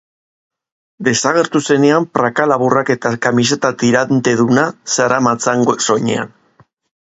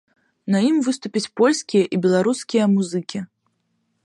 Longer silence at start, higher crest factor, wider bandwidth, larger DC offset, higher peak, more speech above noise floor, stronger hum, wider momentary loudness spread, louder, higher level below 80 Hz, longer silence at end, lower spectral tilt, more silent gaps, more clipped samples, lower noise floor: first, 1 s vs 0.45 s; about the same, 14 dB vs 16 dB; second, 8.2 kHz vs 11.5 kHz; neither; first, 0 dBFS vs -6 dBFS; second, 39 dB vs 51 dB; neither; second, 4 LU vs 13 LU; first, -14 LUFS vs -20 LUFS; first, -58 dBFS vs -68 dBFS; about the same, 0.75 s vs 0.8 s; about the same, -4.5 dB/octave vs -5.5 dB/octave; neither; neither; second, -53 dBFS vs -70 dBFS